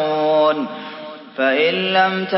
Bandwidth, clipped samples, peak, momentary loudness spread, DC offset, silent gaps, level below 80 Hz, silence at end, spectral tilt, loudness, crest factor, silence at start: 5.8 kHz; under 0.1%; -2 dBFS; 16 LU; under 0.1%; none; -78 dBFS; 0 s; -9 dB/octave; -17 LUFS; 16 dB; 0 s